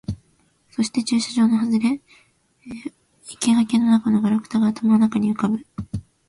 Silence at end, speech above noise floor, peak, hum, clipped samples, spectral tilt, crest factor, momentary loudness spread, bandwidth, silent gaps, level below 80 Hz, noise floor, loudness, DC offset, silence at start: 0.3 s; 42 dB; -6 dBFS; none; under 0.1%; -5.5 dB/octave; 14 dB; 17 LU; 11.5 kHz; none; -52 dBFS; -61 dBFS; -20 LUFS; under 0.1%; 0.1 s